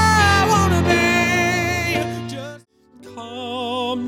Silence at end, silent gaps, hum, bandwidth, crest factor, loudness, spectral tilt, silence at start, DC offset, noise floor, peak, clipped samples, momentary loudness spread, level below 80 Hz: 0 s; none; none; 17.5 kHz; 16 dB; -18 LUFS; -4.5 dB/octave; 0 s; under 0.1%; -47 dBFS; -4 dBFS; under 0.1%; 18 LU; -38 dBFS